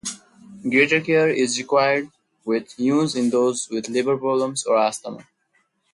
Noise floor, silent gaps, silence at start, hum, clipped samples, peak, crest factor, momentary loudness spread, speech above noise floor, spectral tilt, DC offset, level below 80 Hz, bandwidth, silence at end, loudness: -67 dBFS; none; 0.05 s; none; under 0.1%; -4 dBFS; 18 dB; 15 LU; 47 dB; -4 dB/octave; under 0.1%; -68 dBFS; 11.5 kHz; 0.7 s; -20 LUFS